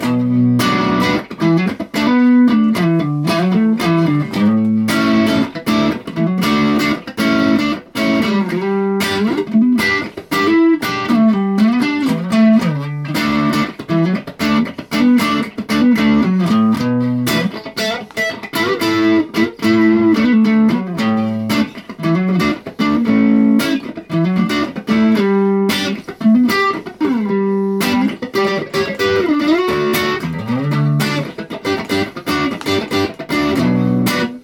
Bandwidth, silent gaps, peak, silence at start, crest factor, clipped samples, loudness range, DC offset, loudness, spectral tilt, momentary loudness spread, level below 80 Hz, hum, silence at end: 17.5 kHz; none; -2 dBFS; 0 s; 12 dB; under 0.1%; 3 LU; under 0.1%; -15 LUFS; -6 dB/octave; 7 LU; -48 dBFS; none; 0.05 s